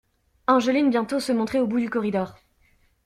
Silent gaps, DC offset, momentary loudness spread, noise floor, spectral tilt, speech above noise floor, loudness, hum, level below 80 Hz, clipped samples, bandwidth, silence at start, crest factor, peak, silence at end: none; under 0.1%; 9 LU; -62 dBFS; -5.5 dB/octave; 40 dB; -23 LUFS; none; -60 dBFS; under 0.1%; 13.5 kHz; 0.5 s; 18 dB; -6 dBFS; 0.75 s